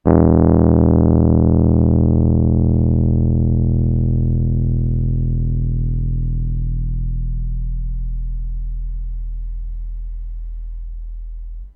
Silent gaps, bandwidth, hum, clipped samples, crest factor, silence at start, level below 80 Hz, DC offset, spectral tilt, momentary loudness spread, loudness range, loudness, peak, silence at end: none; 2.1 kHz; none; under 0.1%; 16 dB; 0.05 s; -22 dBFS; under 0.1%; -15 dB/octave; 19 LU; 15 LU; -17 LUFS; 0 dBFS; 0.05 s